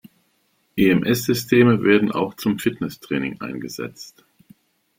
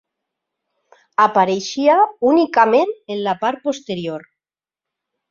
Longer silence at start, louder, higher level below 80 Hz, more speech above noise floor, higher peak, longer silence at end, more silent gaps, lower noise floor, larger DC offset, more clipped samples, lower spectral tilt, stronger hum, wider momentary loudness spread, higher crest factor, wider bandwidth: second, 0.75 s vs 1.2 s; second, -20 LUFS vs -17 LUFS; first, -56 dBFS vs -66 dBFS; second, 46 dB vs 73 dB; about the same, -2 dBFS vs -2 dBFS; second, 0.9 s vs 1.1 s; neither; second, -66 dBFS vs -89 dBFS; neither; neither; about the same, -6 dB/octave vs -5 dB/octave; neither; first, 16 LU vs 11 LU; about the same, 20 dB vs 16 dB; first, 16.5 kHz vs 7.6 kHz